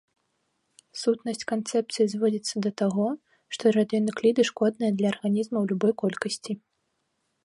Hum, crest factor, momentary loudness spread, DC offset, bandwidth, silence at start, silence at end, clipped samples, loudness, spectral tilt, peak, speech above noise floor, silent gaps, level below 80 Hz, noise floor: none; 18 dB; 8 LU; under 0.1%; 11.5 kHz; 0.95 s; 0.9 s; under 0.1%; -26 LUFS; -5.5 dB/octave; -8 dBFS; 51 dB; none; -74 dBFS; -76 dBFS